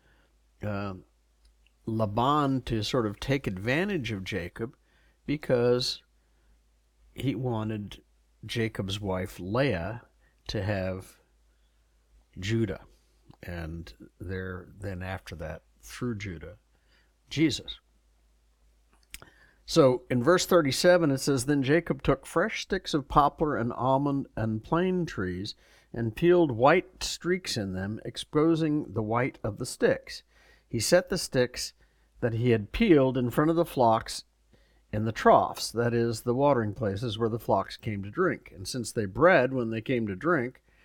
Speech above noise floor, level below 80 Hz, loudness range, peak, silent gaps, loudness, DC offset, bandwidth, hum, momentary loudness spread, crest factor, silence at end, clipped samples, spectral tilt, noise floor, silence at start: 39 dB; -52 dBFS; 11 LU; -6 dBFS; none; -28 LUFS; under 0.1%; 18 kHz; none; 17 LU; 24 dB; 0.35 s; under 0.1%; -5.5 dB/octave; -66 dBFS; 0.6 s